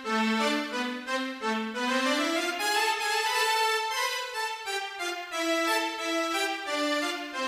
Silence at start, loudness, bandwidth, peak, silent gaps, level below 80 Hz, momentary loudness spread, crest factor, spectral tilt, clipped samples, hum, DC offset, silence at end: 0 s; -28 LUFS; 15.5 kHz; -14 dBFS; none; -76 dBFS; 7 LU; 16 dB; -1.5 dB/octave; under 0.1%; none; under 0.1%; 0 s